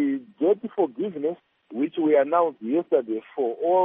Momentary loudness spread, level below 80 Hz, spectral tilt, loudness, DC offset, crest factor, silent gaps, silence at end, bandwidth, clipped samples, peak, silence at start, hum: 9 LU; -78 dBFS; -5.5 dB/octave; -24 LUFS; under 0.1%; 16 dB; none; 0 s; 3.7 kHz; under 0.1%; -8 dBFS; 0 s; none